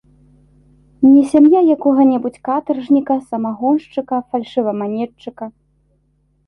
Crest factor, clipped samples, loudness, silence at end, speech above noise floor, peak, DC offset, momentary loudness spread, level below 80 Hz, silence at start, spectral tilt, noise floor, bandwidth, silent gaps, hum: 14 dB; under 0.1%; -15 LUFS; 0.95 s; 46 dB; -2 dBFS; under 0.1%; 15 LU; -58 dBFS; 1 s; -7.5 dB/octave; -60 dBFS; 10.5 kHz; none; none